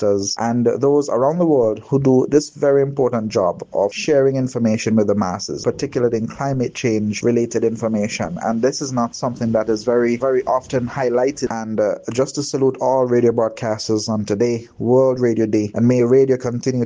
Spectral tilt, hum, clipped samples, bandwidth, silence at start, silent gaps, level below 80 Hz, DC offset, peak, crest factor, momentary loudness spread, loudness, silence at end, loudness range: -6 dB/octave; none; under 0.1%; 9.8 kHz; 0 s; none; -54 dBFS; under 0.1%; -2 dBFS; 16 dB; 6 LU; -18 LUFS; 0 s; 3 LU